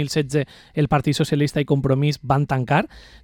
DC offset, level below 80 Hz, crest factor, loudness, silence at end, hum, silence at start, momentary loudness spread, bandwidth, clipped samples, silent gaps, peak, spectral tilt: under 0.1%; -46 dBFS; 16 dB; -21 LUFS; 0.25 s; none; 0 s; 5 LU; 14 kHz; under 0.1%; none; -6 dBFS; -6.5 dB/octave